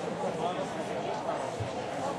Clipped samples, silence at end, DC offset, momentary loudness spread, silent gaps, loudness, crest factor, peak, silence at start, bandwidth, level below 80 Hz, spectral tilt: under 0.1%; 0 s; under 0.1%; 2 LU; none; -34 LUFS; 14 dB; -20 dBFS; 0 s; 13.5 kHz; -66 dBFS; -5 dB/octave